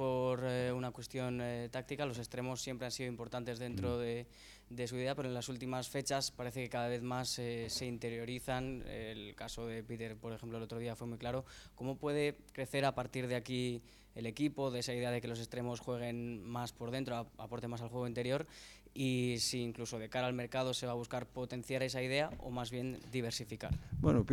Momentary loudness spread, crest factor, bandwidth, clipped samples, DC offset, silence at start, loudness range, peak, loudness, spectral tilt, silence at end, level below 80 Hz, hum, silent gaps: 9 LU; 22 dB; 18.5 kHz; under 0.1%; under 0.1%; 0 s; 4 LU; -18 dBFS; -40 LUFS; -5 dB/octave; 0 s; -60 dBFS; none; none